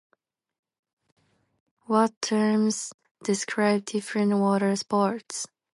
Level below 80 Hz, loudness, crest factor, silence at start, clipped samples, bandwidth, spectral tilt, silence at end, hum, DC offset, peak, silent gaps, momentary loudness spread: -76 dBFS; -25 LUFS; 18 dB; 1.9 s; under 0.1%; 11.5 kHz; -5 dB/octave; 0.3 s; none; under 0.1%; -8 dBFS; 2.17-2.21 s, 2.94-2.99 s, 3.11-3.15 s; 10 LU